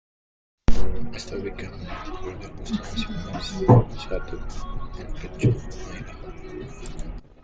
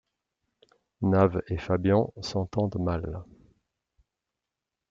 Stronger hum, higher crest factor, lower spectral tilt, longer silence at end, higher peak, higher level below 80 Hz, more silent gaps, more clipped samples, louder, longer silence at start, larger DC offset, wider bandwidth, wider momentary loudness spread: neither; about the same, 20 dB vs 22 dB; about the same, -7 dB/octave vs -8 dB/octave; second, 0.2 s vs 1.65 s; first, -2 dBFS vs -8 dBFS; first, -32 dBFS vs -54 dBFS; neither; neither; about the same, -28 LUFS vs -27 LUFS; second, 0.7 s vs 1 s; neither; about the same, 8 kHz vs 7.6 kHz; first, 18 LU vs 10 LU